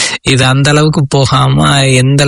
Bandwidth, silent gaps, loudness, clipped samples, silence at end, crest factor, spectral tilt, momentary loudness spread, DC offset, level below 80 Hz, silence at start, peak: 11 kHz; none; -8 LUFS; 0.5%; 0 s; 8 dB; -4.5 dB/octave; 2 LU; under 0.1%; -34 dBFS; 0 s; 0 dBFS